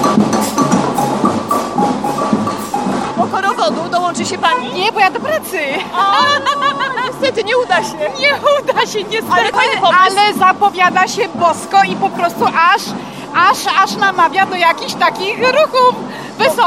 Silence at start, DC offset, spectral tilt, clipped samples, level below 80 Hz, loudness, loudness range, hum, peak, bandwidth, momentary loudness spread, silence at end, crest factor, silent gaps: 0 s; 0.2%; -3.5 dB/octave; under 0.1%; -52 dBFS; -13 LUFS; 4 LU; none; 0 dBFS; 16 kHz; 7 LU; 0 s; 14 dB; none